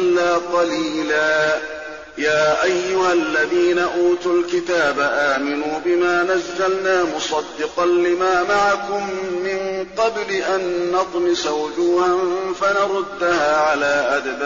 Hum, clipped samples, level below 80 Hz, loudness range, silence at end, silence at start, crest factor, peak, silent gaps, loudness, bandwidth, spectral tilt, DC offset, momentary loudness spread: none; under 0.1%; -54 dBFS; 2 LU; 0 s; 0 s; 12 dB; -8 dBFS; none; -19 LUFS; 7.6 kHz; -2 dB/octave; 0.3%; 6 LU